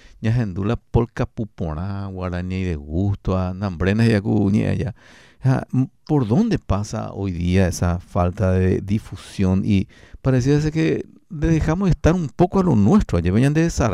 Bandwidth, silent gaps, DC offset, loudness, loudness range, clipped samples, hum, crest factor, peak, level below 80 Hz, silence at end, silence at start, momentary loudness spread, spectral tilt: 12.5 kHz; none; 0.1%; -21 LUFS; 5 LU; under 0.1%; none; 14 dB; -6 dBFS; -34 dBFS; 0 s; 0.2 s; 9 LU; -7.5 dB/octave